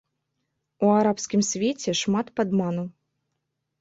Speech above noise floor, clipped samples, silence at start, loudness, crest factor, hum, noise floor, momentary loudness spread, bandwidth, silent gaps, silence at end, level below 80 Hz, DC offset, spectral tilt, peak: 56 dB; under 0.1%; 0.8 s; -24 LUFS; 18 dB; none; -79 dBFS; 8 LU; 8 kHz; none; 0.9 s; -66 dBFS; under 0.1%; -5 dB/octave; -8 dBFS